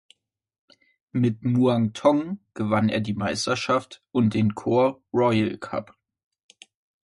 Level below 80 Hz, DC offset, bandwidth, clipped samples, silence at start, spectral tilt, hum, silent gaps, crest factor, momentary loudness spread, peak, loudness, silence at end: -58 dBFS; under 0.1%; 11.5 kHz; under 0.1%; 1.15 s; -6.5 dB/octave; none; none; 18 dB; 9 LU; -6 dBFS; -24 LUFS; 1.2 s